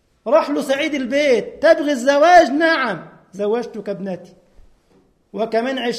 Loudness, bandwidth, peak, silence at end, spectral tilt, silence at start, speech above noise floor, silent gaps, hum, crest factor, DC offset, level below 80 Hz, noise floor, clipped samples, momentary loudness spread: -17 LUFS; 14 kHz; 0 dBFS; 0 s; -4 dB/octave; 0.25 s; 40 dB; none; none; 18 dB; under 0.1%; -56 dBFS; -57 dBFS; under 0.1%; 17 LU